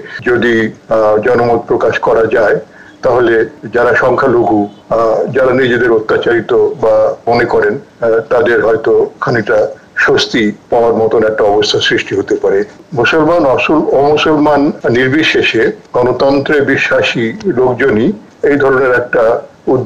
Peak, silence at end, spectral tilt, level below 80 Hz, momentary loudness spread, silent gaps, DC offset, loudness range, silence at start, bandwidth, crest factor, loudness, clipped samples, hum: -2 dBFS; 0 s; -5.5 dB/octave; -42 dBFS; 5 LU; none; under 0.1%; 1 LU; 0 s; 8.8 kHz; 8 dB; -11 LUFS; under 0.1%; none